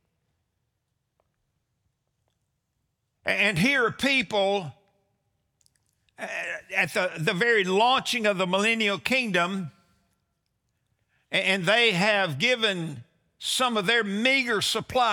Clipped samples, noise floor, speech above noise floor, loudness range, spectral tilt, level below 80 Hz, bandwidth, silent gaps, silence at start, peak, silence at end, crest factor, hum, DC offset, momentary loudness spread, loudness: under 0.1%; -78 dBFS; 54 dB; 5 LU; -3.5 dB/octave; -66 dBFS; over 20 kHz; none; 3.25 s; -6 dBFS; 0 s; 20 dB; none; under 0.1%; 11 LU; -23 LUFS